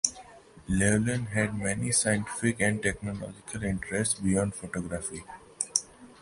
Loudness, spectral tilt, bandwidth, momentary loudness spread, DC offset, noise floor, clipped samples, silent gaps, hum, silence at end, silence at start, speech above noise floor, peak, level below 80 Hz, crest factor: -29 LUFS; -4 dB/octave; 11.5 kHz; 12 LU; under 0.1%; -51 dBFS; under 0.1%; none; none; 0.1 s; 0.05 s; 22 dB; -4 dBFS; -48 dBFS; 26 dB